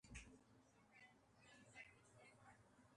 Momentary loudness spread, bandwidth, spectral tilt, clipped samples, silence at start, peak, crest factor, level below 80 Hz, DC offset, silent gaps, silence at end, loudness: 8 LU; 11 kHz; -3.5 dB/octave; under 0.1%; 0.05 s; -44 dBFS; 22 dB; -74 dBFS; under 0.1%; none; 0 s; -66 LUFS